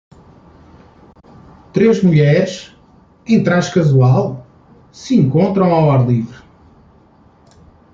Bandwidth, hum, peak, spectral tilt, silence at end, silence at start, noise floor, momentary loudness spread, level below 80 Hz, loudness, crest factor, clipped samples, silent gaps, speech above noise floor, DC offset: 7.6 kHz; none; -2 dBFS; -8 dB/octave; 1.6 s; 1.75 s; -48 dBFS; 17 LU; -50 dBFS; -14 LUFS; 14 dB; under 0.1%; none; 36 dB; under 0.1%